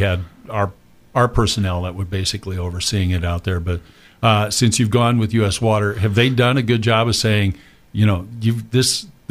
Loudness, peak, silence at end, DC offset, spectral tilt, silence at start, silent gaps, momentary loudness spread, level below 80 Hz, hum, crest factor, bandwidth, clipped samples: -18 LUFS; 0 dBFS; 0.2 s; under 0.1%; -5 dB/octave; 0 s; none; 9 LU; -36 dBFS; none; 18 dB; 15.5 kHz; under 0.1%